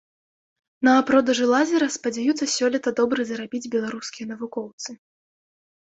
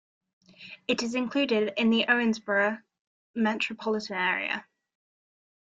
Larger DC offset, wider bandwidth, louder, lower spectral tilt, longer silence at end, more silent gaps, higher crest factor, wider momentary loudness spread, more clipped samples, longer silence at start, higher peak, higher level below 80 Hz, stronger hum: neither; about the same, 8.2 kHz vs 7.8 kHz; first, -22 LUFS vs -27 LUFS; about the same, -3 dB/octave vs -4 dB/octave; second, 1 s vs 1.15 s; second, 4.73-4.78 s vs 3.01-3.34 s; about the same, 18 dB vs 18 dB; first, 14 LU vs 11 LU; neither; first, 0.8 s vs 0.6 s; first, -4 dBFS vs -10 dBFS; first, -68 dBFS vs -74 dBFS; neither